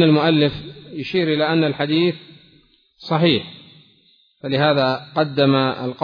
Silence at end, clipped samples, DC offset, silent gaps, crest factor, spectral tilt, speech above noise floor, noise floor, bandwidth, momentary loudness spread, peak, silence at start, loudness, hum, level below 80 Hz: 0 s; under 0.1%; under 0.1%; none; 16 dB; -8.5 dB/octave; 39 dB; -57 dBFS; 5.2 kHz; 17 LU; -2 dBFS; 0 s; -18 LUFS; none; -56 dBFS